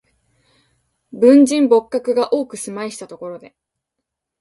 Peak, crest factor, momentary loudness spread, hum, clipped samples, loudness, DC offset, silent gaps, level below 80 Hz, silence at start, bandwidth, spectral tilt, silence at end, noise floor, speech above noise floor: 0 dBFS; 18 dB; 21 LU; none; under 0.1%; -15 LUFS; under 0.1%; none; -66 dBFS; 1.15 s; 11.5 kHz; -4.5 dB/octave; 1.05 s; -80 dBFS; 64 dB